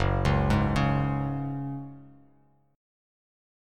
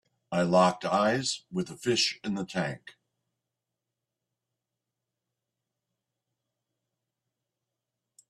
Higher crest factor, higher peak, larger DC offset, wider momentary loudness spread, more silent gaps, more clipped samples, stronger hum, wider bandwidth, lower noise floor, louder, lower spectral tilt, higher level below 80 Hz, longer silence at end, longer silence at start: about the same, 18 dB vs 22 dB; about the same, -10 dBFS vs -12 dBFS; neither; about the same, 13 LU vs 11 LU; neither; neither; neither; second, 9.6 kHz vs 12.5 kHz; second, -64 dBFS vs -87 dBFS; about the same, -27 LUFS vs -28 LUFS; first, -7.5 dB/octave vs -4 dB/octave; first, -38 dBFS vs -70 dBFS; second, 1.65 s vs 5.4 s; second, 0 s vs 0.3 s